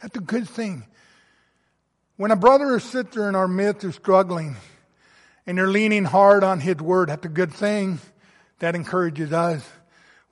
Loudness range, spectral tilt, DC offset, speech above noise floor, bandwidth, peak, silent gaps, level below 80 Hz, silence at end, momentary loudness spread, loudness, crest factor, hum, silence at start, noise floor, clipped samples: 4 LU; -6.5 dB/octave; under 0.1%; 50 dB; 11.5 kHz; -2 dBFS; none; -64 dBFS; 0.65 s; 14 LU; -21 LUFS; 20 dB; none; 0 s; -70 dBFS; under 0.1%